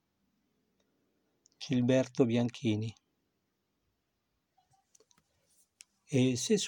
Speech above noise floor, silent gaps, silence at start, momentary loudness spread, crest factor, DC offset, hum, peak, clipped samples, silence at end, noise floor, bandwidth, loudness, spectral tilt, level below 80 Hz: 52 dB; none; 1.6 s; 8 LU; 22 dB; under 0.1%; none; -14 dBFS; under 0.1%; 0 s; -82 dBFS; 17 kHz; -31 LUFS; -5.5 dB/octave; -74 dBFS